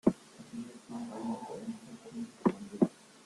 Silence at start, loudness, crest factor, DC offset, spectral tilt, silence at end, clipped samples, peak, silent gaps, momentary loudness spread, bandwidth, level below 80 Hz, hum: 0.05 s; -37 LUFS; 24 dB; under 0.1%; -7.5 dB/octave; 0.05 s; under 0.1%; -12 dBFS; none; 14 LU; 12 kHz; -68 dBFS; none